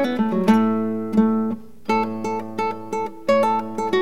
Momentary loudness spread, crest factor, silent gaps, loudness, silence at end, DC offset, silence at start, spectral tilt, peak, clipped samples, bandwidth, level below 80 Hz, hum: 9 LU; 14 dB; none; -21 LUFS; 0 s; 1%; 0 s; -7 dB/octave; -6 dBFS; under 0.1%; 12 kHz; -64 dBFS; none